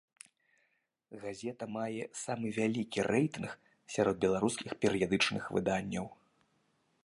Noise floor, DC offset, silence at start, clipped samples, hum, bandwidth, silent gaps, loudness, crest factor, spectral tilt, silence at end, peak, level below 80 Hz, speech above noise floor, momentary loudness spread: -78 dBFS; under 0.1%; 1.1 s; under 0.1%; none; 11.5 kHz; none; -34 LUFS; 20 dB; -5 dB/octave; 0.9 s; -14 dBFS; -66 dBFS; 45 dB; 14 LU